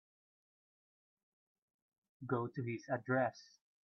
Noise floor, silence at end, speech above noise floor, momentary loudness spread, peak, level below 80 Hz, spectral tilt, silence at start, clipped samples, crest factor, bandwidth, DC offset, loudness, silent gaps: under -90 dBFS; 0.4 s; over 51 dB; 13 LU; -22 dBFS; -86 dBFS; -6.5 dB/octave; 2.2 s; under 0.1%; 22 dB; 6.6 kHz; under 0.1%; -39 LUFS; none